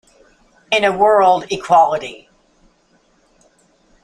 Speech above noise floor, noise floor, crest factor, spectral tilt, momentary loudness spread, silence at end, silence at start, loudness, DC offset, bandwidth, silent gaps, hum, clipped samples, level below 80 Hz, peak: 43 dB; -57 dBFS; 16 dB; -3.5 dB/octave; 9 LU; 1.9 s; 0.7 s; -14 LUFS; under 0.1%; 11.5 kHz; none; none; under 0.1%; -54 dBFS; -2 dBFS